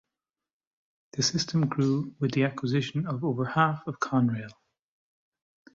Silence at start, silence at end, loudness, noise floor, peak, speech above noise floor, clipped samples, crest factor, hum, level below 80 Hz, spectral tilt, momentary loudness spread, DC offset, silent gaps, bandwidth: 1.15 s; 1.2 s; -28 LUFS; under -90 dBFS; -10 dBFS; over 63 dB; under 0.1%; 20 dB; none; -66 dBFS; -5.5 dB/octave; 6 LU; under 0.1%; none; 7.8 kHz